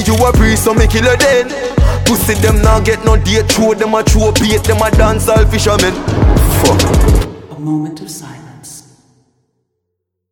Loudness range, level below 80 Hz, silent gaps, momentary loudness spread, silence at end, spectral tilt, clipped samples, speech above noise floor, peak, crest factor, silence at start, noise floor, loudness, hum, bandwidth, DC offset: 5 LU; -16 dBFS; none; 14 LU; 1.5 s; -5 dB/octave; under 0.1%; 63 dB; 0 dBFS; 10 dB; 0 s; -73 dBFS; -11 LUFS; none; 19 kHz; under 0.1%